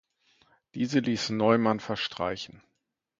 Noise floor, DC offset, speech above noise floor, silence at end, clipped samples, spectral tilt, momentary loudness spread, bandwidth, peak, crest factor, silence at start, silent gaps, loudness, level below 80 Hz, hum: -66 dBFS; under 0.1%; 39 dB; 0.65 s; under 0.1%; -5.5 dB/octave; 15 LU; 7.6 kHz; -6 dBFS; 22 dB; 0.75 s; none; -28 LUFS; -64 dBFS; none